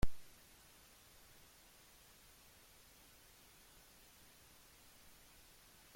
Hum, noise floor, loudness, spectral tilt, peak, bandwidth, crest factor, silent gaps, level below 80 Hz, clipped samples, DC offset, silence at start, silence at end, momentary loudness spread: none; -65 dBFS; -60 LUFS; -4.5 dB/octave; -20 dBFS; 16.5 kHz; 24 dB; none; -56 dBFS; under 0.1%; under 0.1%; 0.05 s; 5.75 s; 0 LU